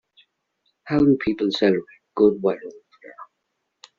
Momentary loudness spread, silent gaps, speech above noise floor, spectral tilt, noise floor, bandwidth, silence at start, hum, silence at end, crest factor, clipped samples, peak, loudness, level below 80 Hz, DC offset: 21 LU; none; 57 dB; -5.5 dB/octave; -77 dBFS; 7.4 kHz; 0.85 s; none; 0.75 s; 18 dB; under 0.1%; -4 dBFS; -21 LUFS; -54 dBFS; under 0.1%